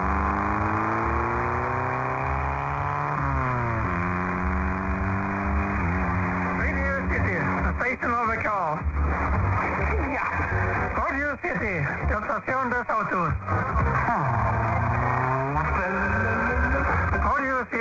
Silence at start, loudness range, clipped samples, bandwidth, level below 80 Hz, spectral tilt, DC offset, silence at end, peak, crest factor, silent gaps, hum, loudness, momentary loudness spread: 0 s; 2 LU; under 0.1%; 7.6 kHz; -32 dBFS; -8.5 dB/octave; under 0.1%; 0 s; -12 dBFS; 12 dB; none; none; -25 LUFS; 3 LU